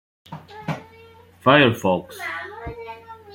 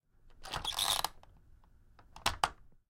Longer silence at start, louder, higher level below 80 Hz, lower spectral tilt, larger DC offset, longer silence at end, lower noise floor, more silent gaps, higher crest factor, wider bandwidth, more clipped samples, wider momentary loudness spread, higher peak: about the same, 0.3 s vs 0.25 s; first, -20 LUFS vs -35 LUFS; about the same, -52 dBFS vs -54 dBFS; first, -6 dB/octave vs -0.5 dB/octave; neither; second, 0 s vs 0.15 s; second, -48 dBFS vs -61 dBFS; neither; second, 22 dB vs 30 dB; about the same, 17 kHz vs 16.5 kHz; neither; first, 25 LU vs 11 LU; first, -2 dBFS vs -10 dBFS